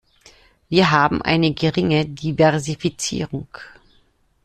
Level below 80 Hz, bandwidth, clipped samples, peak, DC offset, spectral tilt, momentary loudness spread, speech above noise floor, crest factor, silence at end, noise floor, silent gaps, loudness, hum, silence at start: -48 dBFS; 12.5 kHz; under 0.1%; -2 dBFS; under 0.1%; -5 dB/octave; 13 LU; 40 dB; 18 dB; 0.75 s; -59 dBFS; none; -19 LUFS; none; 0.7 s